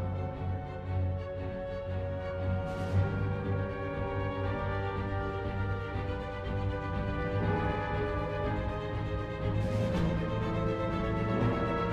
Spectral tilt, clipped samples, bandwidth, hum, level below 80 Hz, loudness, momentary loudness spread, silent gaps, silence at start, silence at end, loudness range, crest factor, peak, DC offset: -8.5 dB/octave; under 0.1%; 7.8 kHz; none; -42 dBFS; -33 LUFS; 6 LU; none; 0 s; 0 s; 2 LU; 16 dB; -18 dBFS; under 0.1%